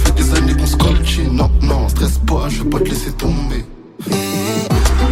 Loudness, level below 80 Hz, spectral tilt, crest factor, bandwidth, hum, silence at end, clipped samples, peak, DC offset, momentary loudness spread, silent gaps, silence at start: -16 LUFS; -16 dBFS; -5.5 dB/octave; 14 dB; 16.5 kHz; none; 0 s; under 0.1%; 0 dBFS; under 0.1%; 7 LU; none; 0 s